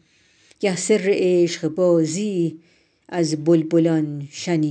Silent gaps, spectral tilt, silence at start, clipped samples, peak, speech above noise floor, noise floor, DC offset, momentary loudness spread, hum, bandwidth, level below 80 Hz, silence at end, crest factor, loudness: none; -6 dB/octave; 0.6 s; under 0.1%; -6 dBFS; 38 dB; -58 dBFS; under 0.1%; 8 LU; none; 10.5 kHz; -72 dBFS; 0 s; 14 dB; -20 LUFS